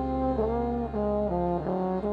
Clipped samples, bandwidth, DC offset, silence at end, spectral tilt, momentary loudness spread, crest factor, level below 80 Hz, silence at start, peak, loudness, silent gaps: under 0.1%; 5.6 kHz; under 0.1%; 0 s; -10.5 dB/octave; 2 LU; 12 dB; -40 dBFS; 0 s; -16 dBFS; -28 LUFS; none